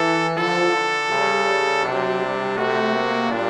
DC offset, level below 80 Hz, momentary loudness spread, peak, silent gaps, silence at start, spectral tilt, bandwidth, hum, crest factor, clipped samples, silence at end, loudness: under 0.1%; -64 dBFS; 4 LU; -6 dBFS; none; 0 s; -4 dB/octave; 11.5 kHz; none; 16 dB; under 0.1%; 0 s; -20 LUFS